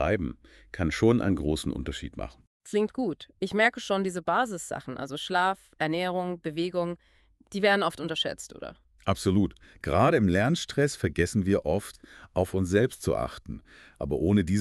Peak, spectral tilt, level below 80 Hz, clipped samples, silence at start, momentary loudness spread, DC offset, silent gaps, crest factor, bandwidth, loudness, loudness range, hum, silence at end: -8 dBFS; -5.5 dB/octave; -46 dBFS; under 0.1%; 0 s; 15 LU; under 0.1%; 2.47-2.60 s; 20 dB; 13 kHz; -28 LUFS; 3 LU; none; 0 s